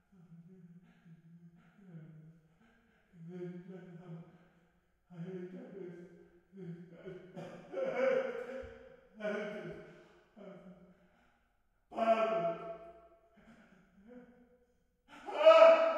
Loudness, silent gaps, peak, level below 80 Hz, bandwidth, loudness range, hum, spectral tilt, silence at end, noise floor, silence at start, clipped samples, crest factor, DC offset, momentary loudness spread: -31 LUFS; none; -10 dBFS; -76 dBFS; 7.8 kHz; 14 LU; none; -5.5 dB/octave; 0 s; -75 dBFS; 0.3 s; under 0.1%; 26 dB; under 0.1%; 26 LU